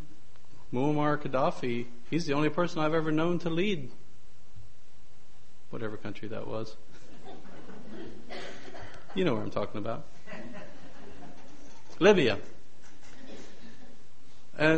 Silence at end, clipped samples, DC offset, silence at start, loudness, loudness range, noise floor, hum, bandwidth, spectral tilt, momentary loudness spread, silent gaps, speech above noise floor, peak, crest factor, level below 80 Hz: 0 s; under 0.1%; 3%; 0 s; -30 LUFS; 13 LU; -60 dBFS; none; 8.4 kHz; -6 dB/octave; 23 LU; none; 31 dB; -8 dBFS; 24 dB; -58 dBFS